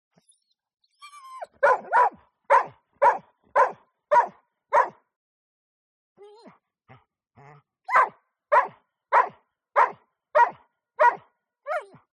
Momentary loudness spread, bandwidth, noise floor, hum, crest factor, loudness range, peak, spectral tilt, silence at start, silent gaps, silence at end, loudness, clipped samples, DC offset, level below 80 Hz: 12 LU; 11 kHz; -67 dBFS; none; 20 dB; 7 LU; -6 dBFS; -3.5 dB/octave; 1.05 s; 5.16-6.16 s; 0.35 s; -23 LUFS; under 0.1%; under 0.1%; -80 dBFS